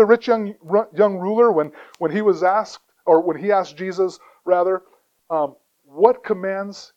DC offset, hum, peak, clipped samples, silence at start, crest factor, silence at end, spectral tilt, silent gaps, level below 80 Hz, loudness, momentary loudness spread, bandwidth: under 0.1%; none; 0 dBFS; under 0.1%; 0 s; 20 dB; 0.1 s; -6.5 dB/octave; none; -70 dBFS; -20 LUFS; 10 LU; 8 kHz